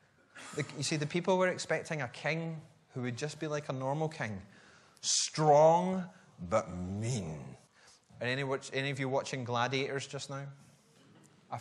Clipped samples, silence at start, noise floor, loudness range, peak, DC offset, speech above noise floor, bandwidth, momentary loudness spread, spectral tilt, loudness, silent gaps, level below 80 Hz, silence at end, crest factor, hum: under 0.1%; 0.35 s; -62 dBFS; 6 LU; -14 dBFS; under 0.1%; 29 dB; 12 kHz; 17 LU; -4 dB/octave; -33 LUFS; none; -70 dBFS; 0 s; 20 dB; none